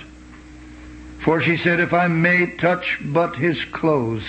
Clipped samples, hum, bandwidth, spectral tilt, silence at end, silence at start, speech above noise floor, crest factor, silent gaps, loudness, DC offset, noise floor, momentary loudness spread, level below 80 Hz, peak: under 0.1%; none; 8.4 kHz; -7.5 dB/octave; 0 s; 0 s; 22 dB; 16 dB; none; -19 LUFS; under 0.1%; -41 dBFS; 6 LU; -46 dBFS; -4 dBFS